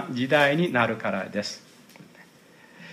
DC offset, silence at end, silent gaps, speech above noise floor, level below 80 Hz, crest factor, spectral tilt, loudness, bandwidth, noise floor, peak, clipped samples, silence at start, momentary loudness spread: under 0.1%; 0 s; none; 29 dB; -72 dBFS; 20 dB; -5.5 dB/octave; -24 LUFS; 15.5 kHz; -53 dBFS; -6 dBFS; under 0.1%; 0 s; 13 LU